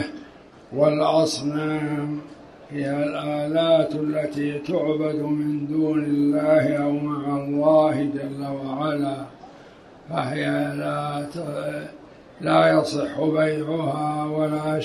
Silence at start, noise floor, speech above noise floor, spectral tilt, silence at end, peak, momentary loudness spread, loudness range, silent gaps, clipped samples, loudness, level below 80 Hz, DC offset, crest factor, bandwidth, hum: 0 s; -46 dBFS; 24 dB; -6.5 dB/octave; 0 s; -6 dBFS; 12 LU; 6 LU; none; under 0.1%; -23 LUFS; -62 dBFS; under 0.1%; 18 dB; 12.5 kHz; none